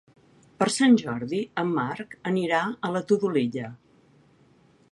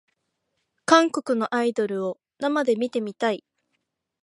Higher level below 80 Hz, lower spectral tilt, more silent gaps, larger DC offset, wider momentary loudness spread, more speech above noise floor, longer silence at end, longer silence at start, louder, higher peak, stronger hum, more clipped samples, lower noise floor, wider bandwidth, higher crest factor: first, -68 dBFS vs -76 dBFS; about the same, -5 dB/octave vs -4 dB/octave; neither; neither; about the same, 11 LU vs 12 LU; second, 34 dB vs 54 dB; first, 1.15 s vs 0.85 s; second, 0.6 s vs 0.9 s; about the same, -25 LUFS vs -23 LUFS; second, -6 dBFS vs -2 dBFS; neither; neither; second, -59 dBFS vs -77 dBFS; about the same, 11.5 kHz vs 11.5 kHz; about the same, 20 dB vs 24 dB